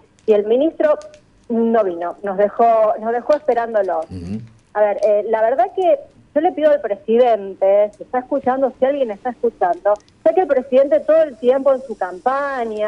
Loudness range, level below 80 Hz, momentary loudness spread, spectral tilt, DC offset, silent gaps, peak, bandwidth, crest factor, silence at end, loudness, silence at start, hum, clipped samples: 2 LU; -58 dBFS; 8 LU; -7 dB/octave; under 0.1%; none; -4 dBFS; 7.8 kHz; 14 dB; 0 s; -17 LUFS; 0.25 s; none; under 0.1%